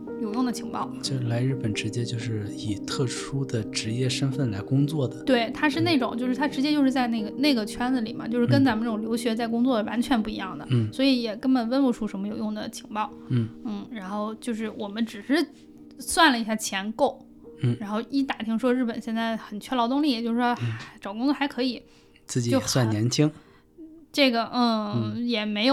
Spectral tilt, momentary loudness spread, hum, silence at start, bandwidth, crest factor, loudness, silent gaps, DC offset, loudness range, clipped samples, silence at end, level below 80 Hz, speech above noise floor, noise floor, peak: -5.5 dB/octave; 9 LU; none; 0 s; 15 kHz; 20 dB; -26 LUFS; none; under 0.1%; 4 LU; under 0.1%; 0 s; -58 dBFS; 23 dB; -48 dBFS; -6 dBFS